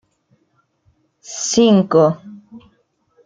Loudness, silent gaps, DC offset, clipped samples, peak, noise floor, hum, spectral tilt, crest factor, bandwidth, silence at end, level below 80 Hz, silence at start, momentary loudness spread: -14 LUFS; none; under 0.1%; under 0.1%; -2 dBFS; -64 dBFS; none; -5 dB/octave; 18 dB; 9.4 kHz; 0.65 s; -60 dBFS; 1.3 s; 19 LU